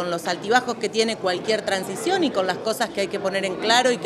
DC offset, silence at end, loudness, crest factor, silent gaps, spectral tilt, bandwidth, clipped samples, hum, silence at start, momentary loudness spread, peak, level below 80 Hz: under 0.1%; 0 s; -22 LUFS; 20 dB; none; -3 dB/octave; 15 kHz; under 0.1%; none; 0 s; 6 LU; -4 dBFS; -64 dBFS